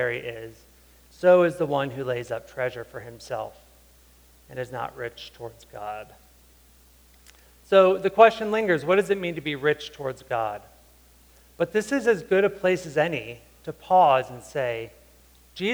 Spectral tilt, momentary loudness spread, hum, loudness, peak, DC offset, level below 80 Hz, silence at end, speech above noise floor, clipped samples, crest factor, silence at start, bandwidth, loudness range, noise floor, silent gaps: -5.5 dB/octave; 21 LU; none; -24 LUFS; -4 dBFS; under 0.1%; -58 dBFS; 0 s; 31 dB; under 0.1%; 22 dB; 0 s; over 20 kHz; 16 LU; -55 dBFS; none